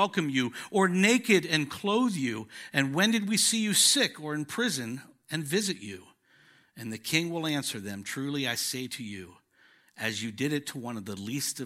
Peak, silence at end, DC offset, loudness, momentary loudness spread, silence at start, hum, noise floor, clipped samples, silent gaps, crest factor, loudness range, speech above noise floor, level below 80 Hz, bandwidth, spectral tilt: -8 dBFS; 0 s; under 0.1%; -28 LUFS; 15 LU; 0 s; none; -63 dBFS; under 0.1%; none; 22 dB; 8 LU; 34 dB; -76 dBFS; 16 kHz; -3 dB/octave